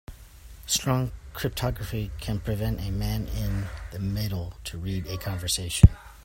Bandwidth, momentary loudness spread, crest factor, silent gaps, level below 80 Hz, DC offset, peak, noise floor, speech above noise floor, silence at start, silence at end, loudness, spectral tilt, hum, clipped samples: 16.5 kHz; 15 LU; 26 dB; none; -34 dBFS; under 0.1%; 0 dBFS; -46 dBFS; 21 dB; 0.1 s; 0 s; -27 LUFS; -5 dB/octave; none; under 0.1%